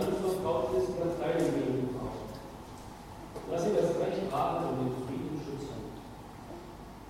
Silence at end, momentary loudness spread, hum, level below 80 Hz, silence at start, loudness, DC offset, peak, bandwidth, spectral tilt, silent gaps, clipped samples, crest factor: 0 s; 17 LU; none; -54 dBFS; 0 s; -33 LUFS; under 0.1%; -16 dBFS; 16 kHz; -6.5 dB/octave; none; under 0.1%; 16 dB